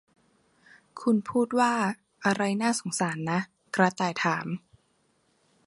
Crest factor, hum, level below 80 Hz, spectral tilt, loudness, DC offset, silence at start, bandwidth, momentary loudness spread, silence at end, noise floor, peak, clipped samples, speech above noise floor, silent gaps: 22 dB; none; -72 dBFS; -5 dB/octave; -27 LUFS; under 0.1%; 0.95 s; 11.5 kHz; 8 LU; 1.1 s; -69 dBFS; -6 dBFS; under 0.1%; 43 dB; none